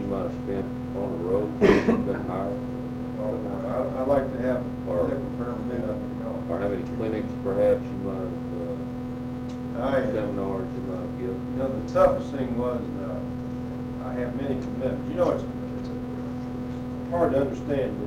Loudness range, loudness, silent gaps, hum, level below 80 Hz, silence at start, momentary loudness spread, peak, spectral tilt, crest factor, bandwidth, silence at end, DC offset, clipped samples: 4 LU; -28 LUFS; none; none; -46 dBFS; 0 s; 10 LU; -8 dBFS; -8 dB/octave; 20 dB; 12.5 kHz; 0 s; under 0.1%; under 0.1%